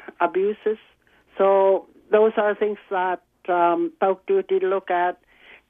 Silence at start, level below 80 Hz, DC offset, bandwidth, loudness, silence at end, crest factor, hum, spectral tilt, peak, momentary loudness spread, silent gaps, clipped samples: 0.2 s; -70 dBFS; under 0.1%; 3.8 kHz; -22 LUFS; 0.55 s; 16 dB; none; -8.5 dB/octave; -6 dBFS; 9 LU; none; under 0.1%